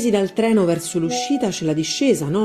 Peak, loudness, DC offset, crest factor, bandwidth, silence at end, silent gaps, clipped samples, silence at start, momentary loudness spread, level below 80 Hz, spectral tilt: -6 dBFS; -19 LUFS; under 0.1%; 12 dB; 14.5 kHz; 0 s; none; under 0.1%; 0 s; 4 LU; -56 dBFS; -5 dB/octave